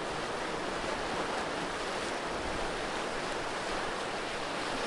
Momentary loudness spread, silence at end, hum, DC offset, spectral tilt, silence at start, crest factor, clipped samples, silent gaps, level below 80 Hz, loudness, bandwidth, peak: 1 LU; 0 s; none; under 0.1%; -3 dB/octave; 0 s; 14 dB; under 0.1%; none; -52 dBFS; -35 LUFS; 11.5 kHz; -20 dBFS